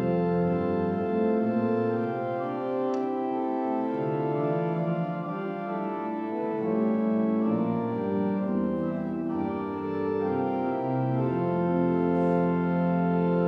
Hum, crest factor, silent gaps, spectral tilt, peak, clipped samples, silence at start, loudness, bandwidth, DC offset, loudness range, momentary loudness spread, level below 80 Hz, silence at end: none; 14 dB; none; -10.5 dB/octave; -14 dBFS; under 0.1%; 0 s; -28 LUFS; 5.2 kHz; under 0.1%; 3 LU; 6 LU; -62 dBFS; 0 s